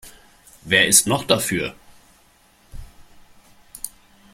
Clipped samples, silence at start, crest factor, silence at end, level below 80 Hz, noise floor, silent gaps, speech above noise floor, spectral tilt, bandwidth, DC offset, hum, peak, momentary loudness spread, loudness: under 0.1%; 0.05 s; 24 dB; 0.45 s; -48 dBFS; -56 dBFS; none; 37 dB; -2 dB/octave; 16.5 kHz; under 0.1%; none; 0 dBFS; 21 LU; -17 LUFS